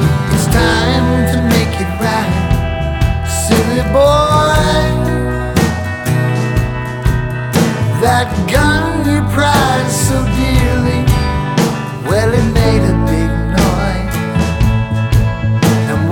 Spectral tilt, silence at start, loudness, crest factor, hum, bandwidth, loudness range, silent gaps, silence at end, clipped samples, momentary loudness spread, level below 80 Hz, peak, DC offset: -5.5 dB/octave; 0 s; -13 LUFS; 12 dB; none; 18.5 kHz; 2 LU; none; 0 s; under 0.1%; 5 LU; -20 dBFS; 0 dBFS; under 0.1%